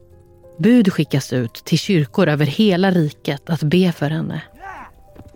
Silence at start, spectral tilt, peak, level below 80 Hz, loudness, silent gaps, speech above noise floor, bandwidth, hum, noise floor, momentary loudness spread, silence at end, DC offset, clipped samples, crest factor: 0.6 s; -6.5 dB/octave; -4 dBFS; -52 dBFS; -18 LUFS; none; 29 dB; 17 kHz; none; -46 dBFS; 15 LU; 0.15 s; under 0.1%; under 0.1%; 14 dB